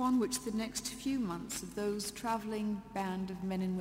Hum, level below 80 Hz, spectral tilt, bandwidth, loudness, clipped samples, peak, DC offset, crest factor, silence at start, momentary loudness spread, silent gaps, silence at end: none; -60 dBFS; -4.5 dB/octave; 16 kHz; -37 LUFS; under 0.1%; -22 dBFS; under 0.1%; 14 dB; 0 s; 4 LU; none; 0 s